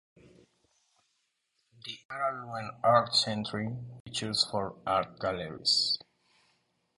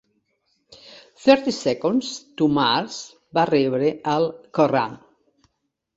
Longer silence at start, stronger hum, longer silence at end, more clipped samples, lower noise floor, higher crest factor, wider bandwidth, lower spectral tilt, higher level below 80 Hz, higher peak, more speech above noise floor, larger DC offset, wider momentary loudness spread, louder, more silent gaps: first, 1.85 s vs 0.85 s; neither; about the same, 1 s vs 1 s; neither; about the same, -78 dBFS vs -76 dBFS; about the same, 24 dB vs 20 dB; first, 11.5 kHz vs 8 kHz; second, -3.5 dB/octave vs -5 dB/octave; about the same, -64 dBFS vs -64 dBFS; second, -10 dBFS vs -2 dBFS; second, 47 dB vs 55 dB; neither; first, 15 LU vs 9 LU; second, -30 LUFS vs -21 LUFS; first, 2.05-2.09 s, 4.00-4.05 s vs none